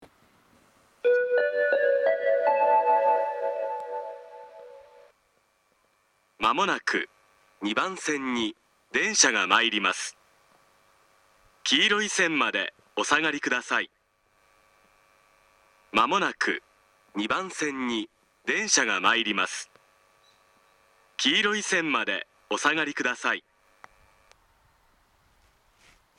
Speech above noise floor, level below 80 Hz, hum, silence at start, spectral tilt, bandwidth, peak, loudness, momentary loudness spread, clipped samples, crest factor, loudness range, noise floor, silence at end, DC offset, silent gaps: 42 dB; -70 dBFS; none; 0 s; -1.5 dB/octave; 12.5 kHz; -4 dBFS; -25 LUFS; 13 LU; under 0.1%; 24 dB; 6 LU; -68 dBFS; 2.8 s; under 0.1%; none